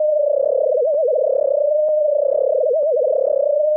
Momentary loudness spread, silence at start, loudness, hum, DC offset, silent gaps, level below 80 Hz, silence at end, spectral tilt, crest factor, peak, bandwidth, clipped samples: 1 LU; 0 s; -17 LUFS; none; under 0.1%; none; -72 dBFS; 0 s; -10.5 dB/octave; 6 dB; -10 dBFS; 1.3 kHz; under 0.1%